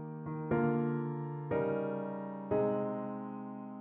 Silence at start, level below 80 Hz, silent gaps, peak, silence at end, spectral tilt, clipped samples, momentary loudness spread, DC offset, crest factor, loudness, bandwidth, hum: 0 s; -68 dBFS; none; -20 dBFS; 0 s; -9.5 dB/octave; under 0.1%; 10 LU; under 0.1%; 16 dB; -36 LUFS; 4 kHz; none